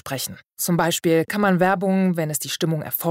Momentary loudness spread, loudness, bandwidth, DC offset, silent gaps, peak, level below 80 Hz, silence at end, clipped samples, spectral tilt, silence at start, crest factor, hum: 9 LU; -21 LUFS; 16.5 kHz; under 0.1%; none; -8 dBFS; -60 dBFS; 0 s; under 0.1%; -5 dB/octave; 0.05 s; 14 dB; none